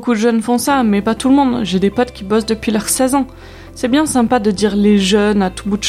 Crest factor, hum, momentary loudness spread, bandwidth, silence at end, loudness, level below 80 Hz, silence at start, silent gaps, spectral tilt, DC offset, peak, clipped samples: 14 dB; none; 6 LU; 15.5 kHz; 0 s; -14 LUFS; -38 dBFS; 0 s; none; -4.5 dB/octave; under 0.1%; 0 dBFS; under 0.1%